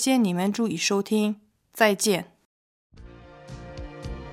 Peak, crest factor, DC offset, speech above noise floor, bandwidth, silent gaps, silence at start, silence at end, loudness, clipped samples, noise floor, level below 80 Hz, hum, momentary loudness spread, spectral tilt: -6 dBFS; 20 dB; under 0.1%; 23 dB; 16 kHz; 2.45-2.90 s; 0 s; 0 s; -24 LUFS; under 0.1%; -46 dBFS; -48 dBFS; none; 21 LU; -4 dB/octave